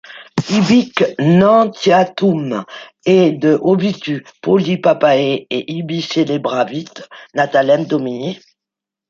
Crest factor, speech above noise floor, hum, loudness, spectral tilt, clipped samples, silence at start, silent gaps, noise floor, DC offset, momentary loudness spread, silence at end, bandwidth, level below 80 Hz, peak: 14 dB; 70 dB; none; -15 LUFS; -6.5 dB/octave; under 0.1%; 0.1 s; none; -85 dBFS; under 0.1%; 12 LU; 0.75 s; 7.6 kHz; -58 dBFS; 0 dBFS